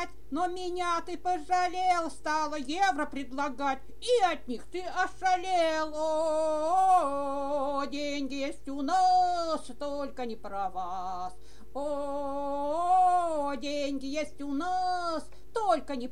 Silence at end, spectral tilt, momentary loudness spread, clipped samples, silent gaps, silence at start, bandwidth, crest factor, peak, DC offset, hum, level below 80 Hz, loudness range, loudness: 0 s; -3.5 dB/octave; 11 LU; under 0.1%; none; 0 s; 12 kHz; 16 dB; -14 dBFS; 1%; none; -56 dBFS; 3 LU; -30 LUFS